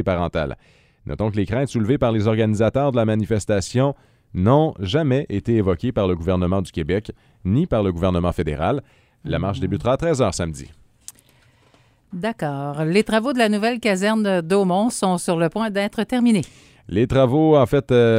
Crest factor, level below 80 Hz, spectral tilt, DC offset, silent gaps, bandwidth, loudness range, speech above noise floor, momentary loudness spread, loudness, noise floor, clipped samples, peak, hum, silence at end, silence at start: 18 dB; -42 dBFS; -6.5 dB/octave; under 0.1%; none; 16 kHz; 5 LU; 37 dB; 10 LU; -20 LUFS; -56 dBFS; under 0.1%; -2 dBFS; none; 0 s; 0 s